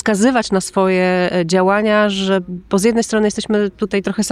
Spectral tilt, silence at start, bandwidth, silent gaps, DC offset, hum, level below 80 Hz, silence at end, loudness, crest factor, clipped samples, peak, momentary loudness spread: -5 dB/octave; 0.05 s; 13 kHz; none; under 0.1%; none; -48 dBFS; 0 s; -16 LUFS; 12 dB; under 0.1%; -4 dBFS; 5 LU